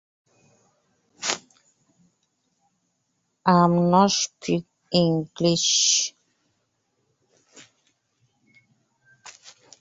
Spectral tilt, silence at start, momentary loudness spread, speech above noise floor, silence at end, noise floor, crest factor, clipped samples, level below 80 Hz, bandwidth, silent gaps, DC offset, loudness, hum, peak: -3.5 dB/octave; 1.2 s; 12 LU; 54 dB; 0.3 s; -74 dBFS; 24 dB; under 0.1%; -66 dBFS; 8 kHz; none; under 0.1%; -21 LUFS; none; -2 dBFS